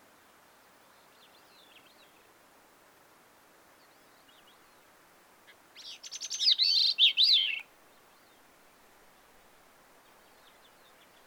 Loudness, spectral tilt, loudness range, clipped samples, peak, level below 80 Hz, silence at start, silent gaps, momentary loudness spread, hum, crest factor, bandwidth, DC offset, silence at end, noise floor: -24 LUFS; 3 dB/octave; 13 LU; under 0.1%; -12 dBFS; -80 dBFS; 5.75 s; none; 23 LU; none; 22 dB; over 20 kHz; under 0.1%; 3.65 s; -61 dBFS